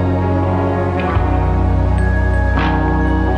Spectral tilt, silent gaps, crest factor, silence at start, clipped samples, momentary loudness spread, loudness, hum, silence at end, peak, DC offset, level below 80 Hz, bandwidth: -9 dB/octave; none; 12 dB; 0 s; under 0.1%; 1 LU; -16 LUFS; none; 0 s; -2 dBFS; under 0.1%; -18 dBFS; 8.4 kHz